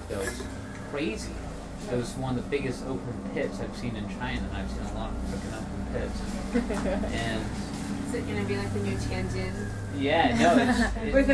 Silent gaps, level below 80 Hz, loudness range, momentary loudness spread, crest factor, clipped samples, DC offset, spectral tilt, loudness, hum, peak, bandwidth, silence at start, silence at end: none; -38 dBFS; 7 LU; 11 LU; 20 dB; under 0.1%; under 0.1%; -5.5 dB/octave; -30 LUFS; none; -10 dBFS; 11 kHz; 0 s; 0 s